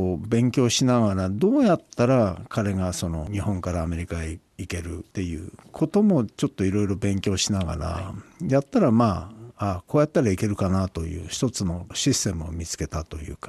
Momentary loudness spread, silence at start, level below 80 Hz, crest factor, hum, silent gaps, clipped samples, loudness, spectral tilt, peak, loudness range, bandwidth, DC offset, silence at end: 12 LU; 0 s; -46 dBFS; 16 dB; none; none; under 0.1%; -24 LUFS; -5.5 dB/octave; -8 dBFS; 4 LU; 13 kHz; under 0.1%; 0 s